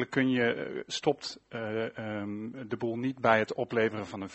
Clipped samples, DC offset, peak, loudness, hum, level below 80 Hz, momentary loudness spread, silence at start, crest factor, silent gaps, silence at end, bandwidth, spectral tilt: under 0.1%; under 0.1%; -8 dBFS; -31 LUFS; none; -70 dBFS; 12 LU; 0 s; 22 dB; none; 0 s; 8.2 kHz; -5.5 dB/octave